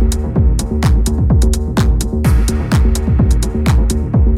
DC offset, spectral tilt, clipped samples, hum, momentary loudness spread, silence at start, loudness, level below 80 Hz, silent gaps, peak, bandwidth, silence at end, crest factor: 1%; -6.5 dB/octave; under 0.1%; none; 2 LU; 0 s; -14 LUFS; -14 dBFS; none; -2 dBFS; 14.5 kHz; 0 s; 10 dB